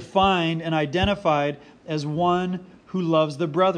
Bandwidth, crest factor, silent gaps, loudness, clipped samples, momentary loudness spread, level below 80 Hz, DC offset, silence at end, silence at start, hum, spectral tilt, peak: 10 kHz; 18 dB; none; -23 LUFS; under 0.1%; 10 LU; -46 dBFS; under 0.1%; 0 s; 0 s; none; -6.5 dB/octave; -6 dBFS